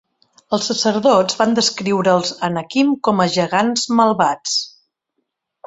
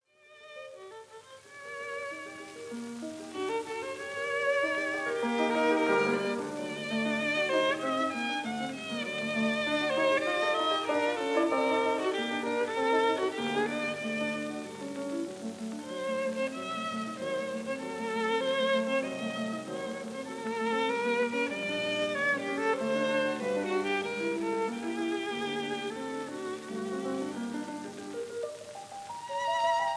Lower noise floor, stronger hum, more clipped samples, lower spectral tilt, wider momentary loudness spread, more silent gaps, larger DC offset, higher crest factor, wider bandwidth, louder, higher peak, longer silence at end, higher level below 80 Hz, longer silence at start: first, -74 dBFS vs -55 dBFS; neither; neither; about the same, -4 dB/octave vs -4 dB/octave; second, 7 LU vs 12 LU; neither; neither; about the same, 16 dB vs 16 dB; second, 8.2 kHz vs 11 kHz; first, -17 LUFS vs -31 LUFS; first, -2 dBFS vs -14 dBFS; first, 1 s vs 0 s; first, -60 dBFS vs -78 dBFS; first, 0.5 s vs 0.3 s